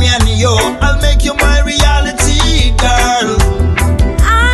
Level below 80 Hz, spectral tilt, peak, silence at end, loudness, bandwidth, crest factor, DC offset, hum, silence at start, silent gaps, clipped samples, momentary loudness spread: -12 dBFS; -4 dB/octave; 0 dBFS; 0 s; -11 LUFS; 12.5 kHz; 10 dB; under 0.1%; none; 0 s; none; under 0.1%; 2 LU